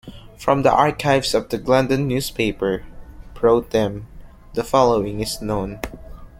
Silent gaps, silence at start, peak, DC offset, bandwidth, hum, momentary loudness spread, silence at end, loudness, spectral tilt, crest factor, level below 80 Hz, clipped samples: none; 0.05 s; -2 dBFS; under 0.1%; 16.5 kHz; none; 12 LU; 0.1 s; -20 LUFS; -5.5 dB/octave; 18 dB; -40 dBFS; under 0.1%